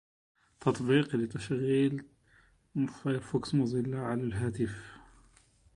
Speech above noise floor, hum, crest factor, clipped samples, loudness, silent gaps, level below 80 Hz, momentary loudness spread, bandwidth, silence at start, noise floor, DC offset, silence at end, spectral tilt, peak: 34 dB; none; 20 dB; under 0.1%; -32 LUFS; none; -60 dBFS; 8 LU; 11 kHz; 0.6 s; -65 dBFS; under 0.1%; 0.75 s; -7 dB/octave; -12 dBFS